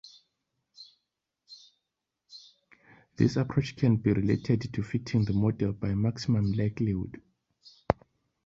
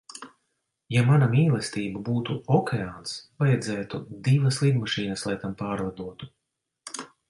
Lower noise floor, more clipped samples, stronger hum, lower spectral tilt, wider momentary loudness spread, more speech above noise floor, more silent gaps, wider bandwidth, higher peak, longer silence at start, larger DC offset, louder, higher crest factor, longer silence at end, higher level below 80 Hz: first, -85 dBFS vs -78 dBFS; neither; neither; first, -8 dB/octave vs -6 dB/octave; second, 10 LU vs 17 LU; first, 58 dB vs 53 dB; neither; second, 7.6 kHz vs 11.5 kHz; first, -4 dBFS vs -10 dBFS; first, 0.8 s vs 0.15 s; neither; second, -29 LUFS vs -25 LUFS; first, 28 dB vs 16 dB; first, 0.5 s vs 0.25 s; first, -52 dBFS vs -58 dBFS